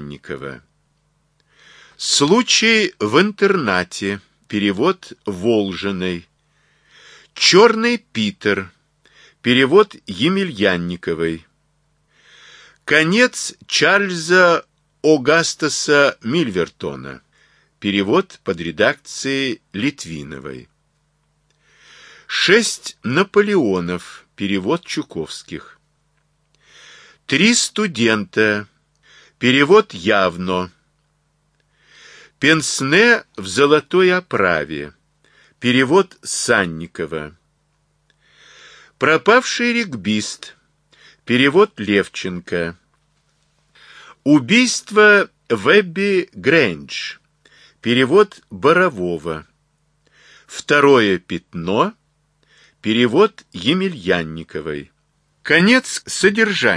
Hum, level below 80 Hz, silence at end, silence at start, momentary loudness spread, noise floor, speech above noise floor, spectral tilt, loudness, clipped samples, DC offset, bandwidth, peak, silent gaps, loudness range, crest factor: none; -56 dBFS; 0 s; 0 s; 16 LU; -64 dBFS; 48 dB; -4 dB/octave; -16 LUFS; under 0.1%; under 0.1%; 11 kHz; 0 dBFS; none; 5 LU; 18 dB